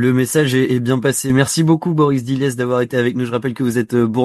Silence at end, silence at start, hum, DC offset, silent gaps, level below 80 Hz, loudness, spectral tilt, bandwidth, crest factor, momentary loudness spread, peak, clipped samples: 0 s; 0 s; none; under 0.1%; none; -52 dBFS; -16 LUFS; -5.5 dB/octave; 13 kHz; 14 dB; 5 LU; 0 dBFS; under 0.1%